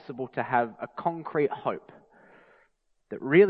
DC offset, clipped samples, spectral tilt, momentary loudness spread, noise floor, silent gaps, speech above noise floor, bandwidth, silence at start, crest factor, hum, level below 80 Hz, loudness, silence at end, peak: under 0.1%; under 0.1%; -10 dB/octave; 11 LU; -69 dBFS; none; 42 dB; 4.6 kHz; 0.1 s; 20 dB; none; -74 dBFS; -30 LUFS; 0 s; -8 dBFS